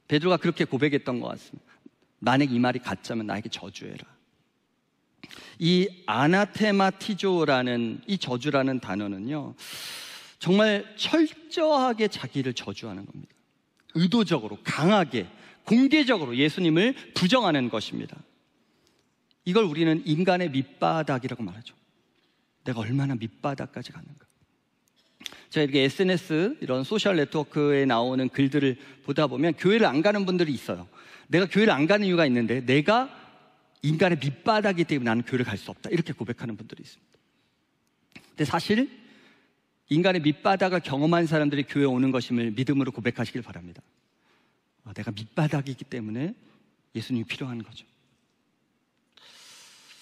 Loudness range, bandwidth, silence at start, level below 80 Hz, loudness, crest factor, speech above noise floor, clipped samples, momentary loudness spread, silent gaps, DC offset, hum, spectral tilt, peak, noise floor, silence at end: 10 LU; 15 kHz; 0.1 s; -70 dBFS; -25 LUFS; 18 dB; 47 dB; under 0.1%; 15 LU; none; under 0.1%; none; -6 dB/octave; -8 dBFS; -72 dBFS; 2.2 s